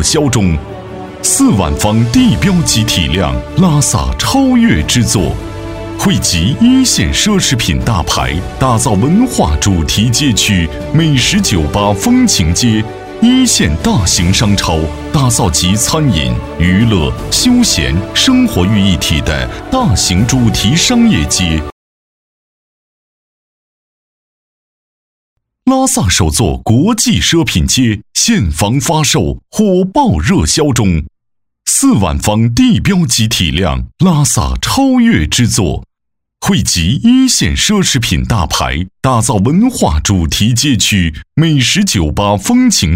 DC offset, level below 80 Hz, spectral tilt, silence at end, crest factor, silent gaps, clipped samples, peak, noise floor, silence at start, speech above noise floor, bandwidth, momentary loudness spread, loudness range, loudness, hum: under 0.1%; -24 dBFS; -4 dB/octave; 0 s; 10 dB; 21.72-25.36 s; under 0.1%; 0 dBFS; -72 dBFS; 0 s; 62 dB; 16.5 kHz; 6 LU; 2 LU; -11 LUFS; none